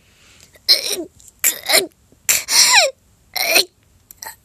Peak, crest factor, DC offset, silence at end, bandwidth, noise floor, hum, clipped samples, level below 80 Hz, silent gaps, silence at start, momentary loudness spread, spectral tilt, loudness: 0 dBFS; 18 dB; under 0.1%; 0.1 s; over 20 kHz; -49 dBFS; none; under 0.1%; -58 dBFS; none; 0.7 s; 18 LU; 1.5 dB/octave; -14 LUFS